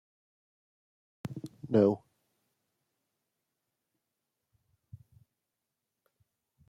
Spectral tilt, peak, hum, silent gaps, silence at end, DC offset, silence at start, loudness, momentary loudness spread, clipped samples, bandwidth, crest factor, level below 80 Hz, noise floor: -9 dB/octave; -12 dBFS; none; none; 4.7 s; under 0.1%; 1.25 s; -29 LUFS; 18 LU; under 0.1%; 11.5 kHz; 26 dB; -76 dBFS; -87 dBFS